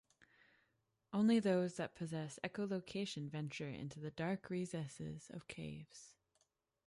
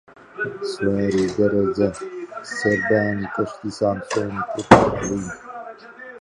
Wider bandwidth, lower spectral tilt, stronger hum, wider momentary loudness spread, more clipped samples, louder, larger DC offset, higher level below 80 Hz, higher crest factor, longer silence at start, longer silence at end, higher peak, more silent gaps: about the same, 11.5 kHz vs 11 kHz; about the same, -6 dB/octave vs -6 dB/octave; neither; second, 16 LU vs 21 LU; neither; second, -42 LUFS vs -21 LUFS; neither; second, -74 dBFS vs -46 dBFS; about the same, 20 dB vs 22 dB; first, 1.1 s vs 0.35 s; first, 0.75 s vs 0.05 s; second, -24 dBFS vs 0 dBFS; neither